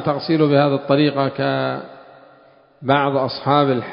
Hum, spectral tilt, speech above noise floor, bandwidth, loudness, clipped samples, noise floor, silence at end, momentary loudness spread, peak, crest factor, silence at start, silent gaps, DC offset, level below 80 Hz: none; -11 dB/octave; 33 dB; 5.4 kHz; -18 LUFS; under 0.1%; -50 dBFS; 0 s; 10 LU; 0 dBFS; 18 dB; 0 s; none; under 0.1%; -60 dBFS